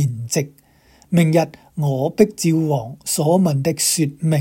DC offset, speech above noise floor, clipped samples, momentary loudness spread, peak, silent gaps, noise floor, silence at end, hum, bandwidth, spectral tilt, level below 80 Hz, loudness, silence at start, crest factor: under 0.1%; 35 dB; under 0.1%; 7 LU; 0 dBFS; none; -53 dBFS; 0 s; none; 17 kHz; -5.5 dB/octave; -56 dBFS; -18 LUFS; 0 s; 18 dB